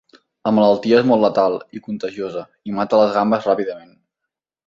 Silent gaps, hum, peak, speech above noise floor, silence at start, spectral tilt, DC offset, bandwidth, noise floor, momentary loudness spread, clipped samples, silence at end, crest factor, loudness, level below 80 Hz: none; none; -2 dBFS; 65 dB; 0.45 s; -7 dB/octave; under 0.1%; 7.6 kHz; -82 dBFS; 14 LU; under 0.1%; 0.9 s; 18 dB; -18 LUFS; -60 dBFS